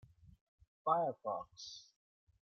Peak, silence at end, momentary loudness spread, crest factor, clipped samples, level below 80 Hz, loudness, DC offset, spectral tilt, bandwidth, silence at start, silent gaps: -20 dBFS; 0.6 s; 16 LU; 22 dB; under 0.1%; -76 dBFS; -39 LUFS; under 0.1%; -5 dB/octave; 6.8 kHz; 0.25 s; 0.41-0.58 s, 0.67-0.85 s